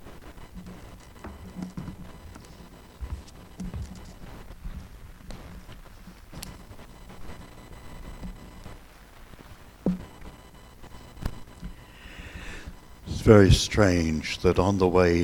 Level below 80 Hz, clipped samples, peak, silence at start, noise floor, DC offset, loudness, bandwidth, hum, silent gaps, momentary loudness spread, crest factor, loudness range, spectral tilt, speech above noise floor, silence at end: -40 dBFS; under 0.1%; -2 dBFS; 0.05 s; -48 dBFS; under 0.1%; -23 LUFS; 18.5 kHz; none; none; 26 LU; 26 dB; 22 LU; -6 dB/octave; 29 dB; 0 s